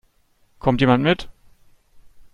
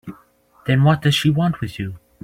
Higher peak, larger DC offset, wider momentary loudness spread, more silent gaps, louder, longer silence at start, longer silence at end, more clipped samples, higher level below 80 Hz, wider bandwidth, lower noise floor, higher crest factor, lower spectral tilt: about the same, -2 dBFS vs -4 dBFS; neither; second, 10 LU vs 15 LU; neither; about the same, -19 LUFS vs -18 LUFS; first, 0.65 s vs 0.05 s; first, 1.05 s vs 0.25 s; neither; first, -44 dBFS vs -50 dBFS; second, 10 kHz vs 15.5 kHz; first, -60 dBFS vs -53 dBFS; about the same, 20 dB vs 16 dB; first, -7.5 dB/octave vs -6 dB/octave